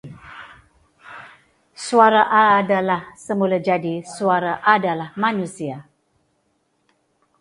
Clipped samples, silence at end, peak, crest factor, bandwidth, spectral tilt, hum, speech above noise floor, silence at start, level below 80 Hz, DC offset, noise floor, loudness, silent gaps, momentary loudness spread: under 0.1%; 1.6 s; 0 dBFS; 20 dB; 11.5 kHz; -5 dB/octave; none; 49 dB; 0.05 s; -64 dBFS; under 0.1%; -67 dBFS; -18 LUFS; none; 25 LU